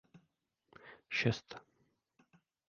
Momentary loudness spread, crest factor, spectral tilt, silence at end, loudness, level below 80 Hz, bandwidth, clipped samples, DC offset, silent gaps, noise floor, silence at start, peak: 23 LU; 26 dB; -4 dB/octave; 1.1 s; -37 LUFS; -72 dBFS; 7 kHz; under 0.1%; under 0.1%; none; -81 dBFS; 0.15 s; -18 dBFS